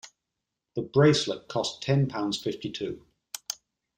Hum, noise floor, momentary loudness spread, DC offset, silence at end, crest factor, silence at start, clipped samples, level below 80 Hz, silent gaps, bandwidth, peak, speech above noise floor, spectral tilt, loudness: none; -85 dBFS; 17 LU; under 0.1%; 0.45 s; 20 dB; 0.05 s; under 0.1%; -64 dBFS; none; 16 kHz; -8 dBFS; 59 dB; -5.5 dB/octave; -27 LUFS